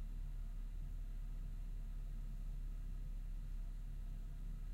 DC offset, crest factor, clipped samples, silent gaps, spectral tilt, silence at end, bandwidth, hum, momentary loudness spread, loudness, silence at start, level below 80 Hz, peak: under 0.1%; 8 dB; under 0.1%; none; -7 dB/octave; 0 s; 7.2 kHz; none; 1 LU; -51 LUFS; 0 s; -44 dBFS; -38 dBFS